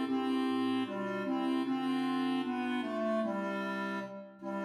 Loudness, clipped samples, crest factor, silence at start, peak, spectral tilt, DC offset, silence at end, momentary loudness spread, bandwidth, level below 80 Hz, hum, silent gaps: -34 LUFS; under 0.1%; 12 dB; 0 s; -22 dBFS; -6 dB/octave; under 0.1%; 0 s; 6 LU; 11.5 kHz; -88 dBFS; none; none